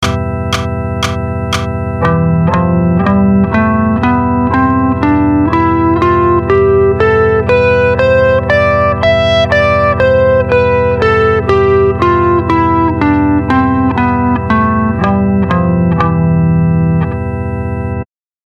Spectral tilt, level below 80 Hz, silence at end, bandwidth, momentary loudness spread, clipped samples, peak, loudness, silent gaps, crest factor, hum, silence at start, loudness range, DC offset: -7.5 dB/octave; -26 dBFS; 0.4 s; 11.5 kHz; 6 LU; under 0.1%; 0 dBFS; -11 LUFS; none; 10 dB; none; 0 s; 2 LU; under 0.1%